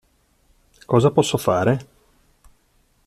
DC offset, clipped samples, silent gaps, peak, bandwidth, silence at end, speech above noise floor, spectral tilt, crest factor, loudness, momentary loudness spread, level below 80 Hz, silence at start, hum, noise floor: under 0.1%; under 0.1%; none; -4 dBFS; 15 kHz; 1.25 s; 44 dB; -6 dB/octave; 20 dB; -19 LUFS; 5 LU; -52 dBFS; 0.9 s; none; -62 dBFS